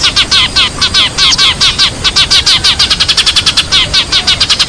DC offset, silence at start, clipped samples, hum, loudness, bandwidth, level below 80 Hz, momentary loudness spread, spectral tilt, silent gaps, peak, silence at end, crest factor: 0.5%; 0 s; 0.4%; none; -6 LUFS; 11 kHz; -26 dBFS; 3 LU; -0.5 dB/octave; none; 0 dBFS; 0 s; 8 dB